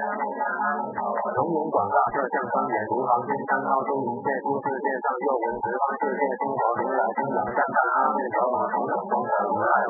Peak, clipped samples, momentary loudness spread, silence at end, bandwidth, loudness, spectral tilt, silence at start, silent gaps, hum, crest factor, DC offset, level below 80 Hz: -8 dBFS; under 0.1%; 5 LU; 0 s; 2.2 kHz; -25 LUFS; -12.5 dB/octave; 0 s; none; none; 16 dB; under 0.1%; -66 dBFS